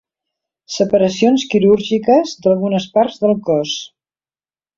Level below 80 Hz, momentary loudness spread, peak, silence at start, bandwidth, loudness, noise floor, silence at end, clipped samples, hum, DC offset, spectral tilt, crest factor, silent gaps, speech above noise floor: -56 dBFS; 8 LU; -2 dBFS; 0.7 s; 7.6 kHz; -15 LUFS; under -90 dBFS; 0.9 s; under 0.1%; none; under 0.1%; -5.5 dB/octave; 14 dB; none; over 76 dB